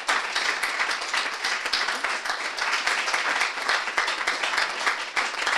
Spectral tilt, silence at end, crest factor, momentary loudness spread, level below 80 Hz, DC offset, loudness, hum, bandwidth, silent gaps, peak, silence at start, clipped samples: 1.5 dB/octave; 0 s; 20 dB; 3 LU; -64 dBFS; under 0.1%; -24 LUFS; none; 16 kHz; none; -6 dBFS; 0 s; under 0.1%